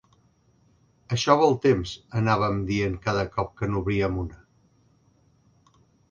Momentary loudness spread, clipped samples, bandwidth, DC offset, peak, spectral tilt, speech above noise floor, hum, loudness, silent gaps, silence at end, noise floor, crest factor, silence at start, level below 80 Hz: 11 LU; under 0.1%; 9.2 kHz; under 0.1%; -4 dBFS; -6 dB/octave; 39 dB; none; -25 LUFS; none; 1.75 s; -63 dBFS; 22 dB; 1.1 s; -46 dBFS